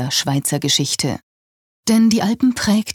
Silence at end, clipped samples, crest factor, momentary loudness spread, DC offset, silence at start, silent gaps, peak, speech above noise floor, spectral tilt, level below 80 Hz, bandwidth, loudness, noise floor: 0 s; under 0.1%; 14 dB; 9 LU; under 0.1%; 0 s; 1.23-1.83 s; -4 dBFS; over 73 dB; -4 dB/octave; -54 dBFS; 17.5 kHz; -17 LUFS; under -90 dBFS